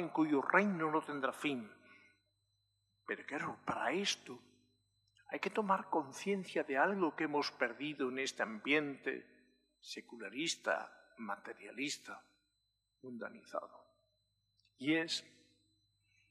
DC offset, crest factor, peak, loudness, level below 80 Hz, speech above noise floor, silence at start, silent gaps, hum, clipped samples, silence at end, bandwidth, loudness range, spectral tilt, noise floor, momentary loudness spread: under 0.1%; 26 dB; -14 dBFS; -38 LUFS; -88 dBFS; 46 dB; 0 s; none; 50 Hz at -70 dBFS; under 0.1%; 1.05 s; 13.5 kHz; 7 LU; -4 dB/octave; -84 dBFS; 15 LU